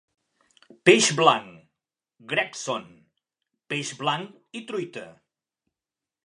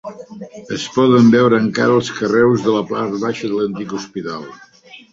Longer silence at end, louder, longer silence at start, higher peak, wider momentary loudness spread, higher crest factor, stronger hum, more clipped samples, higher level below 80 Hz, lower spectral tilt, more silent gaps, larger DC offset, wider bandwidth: first, 1.15 s vs 0.15 s; second, -23 LUFS vs -16 LUFS; first, 0.85 s vs 0.05 s; about the same, 0 dBFS vs -2 dBFS; about the same, 19 LU vs 21 LU; first, 26 dB vs 14 dB; neither; neither; second, -76 dBFS vs -56 dBFS; second, -3 dB/octave vs -6 dB/octave; neither; neither; first, 11.5 kHz vs 7.8 kHz